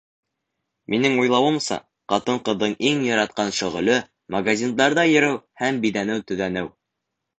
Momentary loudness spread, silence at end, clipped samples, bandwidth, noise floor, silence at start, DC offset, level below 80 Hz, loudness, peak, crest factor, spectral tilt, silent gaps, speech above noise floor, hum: 9 LU; 0.7 s; under 0.1%; 9.2 kHz; -81 dBFS; 0.9 s; under 0.1%; -60 dBFS; -21 LUFS; -4 dBFS; 18 dB; -4 dB/octave; none; 60 dB; none